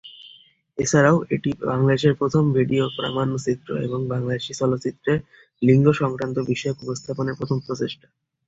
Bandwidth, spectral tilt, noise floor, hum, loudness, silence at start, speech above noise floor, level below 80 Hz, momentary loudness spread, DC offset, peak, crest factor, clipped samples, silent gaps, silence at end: 8 kHz; -6 dB/octave; -52 dBFS; none; -22 LUFS; 0.05 s; 30 dB; -54 dBFS; 11 LU; under 0.1%; -4 dBFS; 18 dB; under 0.1%; none; 0.55 s